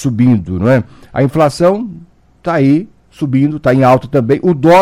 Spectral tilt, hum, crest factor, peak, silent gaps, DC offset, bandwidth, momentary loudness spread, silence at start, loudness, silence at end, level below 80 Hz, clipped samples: -8 dB/octave; none; 12 dB; 0 dBFS; none; under 0.1%; 15 kHz; 12 LU; 0 s; -12 LUFS; 0 s; -42 dBFS; under 0.1%